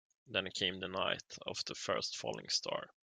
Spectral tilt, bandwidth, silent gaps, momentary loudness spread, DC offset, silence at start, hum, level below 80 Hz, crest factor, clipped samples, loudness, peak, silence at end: -2 dB/octave; 11.5 kHz; none; 6 LU; under 0.1%; 0.25 s; none; -78 dBFS; 22 dB; under 0.1%; -38 LUFS; -18 dBFS; 0.2 s